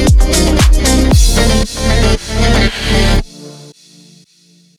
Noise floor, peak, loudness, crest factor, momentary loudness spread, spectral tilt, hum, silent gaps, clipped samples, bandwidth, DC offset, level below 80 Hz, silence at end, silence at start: -48 dBFS; 0 dBFS; -12 LUFS; 10 dB; 6 LU; -4.5 dB/octave; none; none; under 0.1%; 15 kHz; under 0.1%; -14 dBFS; 1.1 s; 0 s